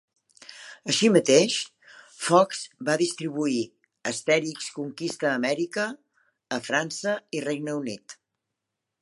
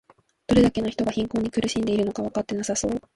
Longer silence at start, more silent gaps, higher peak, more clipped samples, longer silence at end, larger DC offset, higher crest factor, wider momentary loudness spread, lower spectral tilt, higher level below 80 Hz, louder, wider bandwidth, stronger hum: about the same, 0.5 s vs 0.5 s; neither; about the same, -4 dBFS vs -6 dBFS; neither; first, 0.9 s vs 0.15 s; neither; about the same, 22 dB vs 18 dB; first, 17 LU vs 8 LU; second, -3.5 dB/octave vs -5 dB/octave; second, -78 dBFS vs -46 dBFS; about the same, -25 LUFS vs -24 LUFS; about the same, 11.5 kHz vs 11.5 kHz; neither